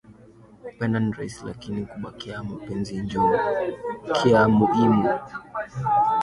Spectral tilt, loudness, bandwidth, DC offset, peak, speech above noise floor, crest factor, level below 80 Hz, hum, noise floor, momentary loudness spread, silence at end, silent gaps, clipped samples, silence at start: -7 dB/octave; -23 LUFS; 11 kHz; under 0.1%; -6 dBFS; 27 dB; 18 dB; -52 dBFS; none; -50 dBFS; 16 LU; 0 s; none; under 0.1%; 0.1 s